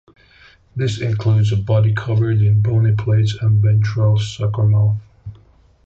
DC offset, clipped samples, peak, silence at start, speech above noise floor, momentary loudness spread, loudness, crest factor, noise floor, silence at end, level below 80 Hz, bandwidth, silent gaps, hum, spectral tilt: under 0.1%; under 0.1%; -6 dBFS; 0.75 s; 35 dB; 7 LU; -17 LUFS; 10 dB; -50 dBFS; 0.5 s; -40 dBFS; 7.8 kHz; none; none; -7.5 dB/octave